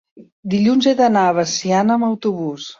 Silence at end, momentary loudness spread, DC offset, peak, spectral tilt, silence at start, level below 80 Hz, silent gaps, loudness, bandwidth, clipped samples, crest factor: 0.05 s; 8 LU; under 0.1%; -2 dBFS; -5 dB/octave; 0.15 s; -62 dBFS; 0.32-0.43 s; -16 LUFS; 7.6 kHz; under 0.1%; 14 dB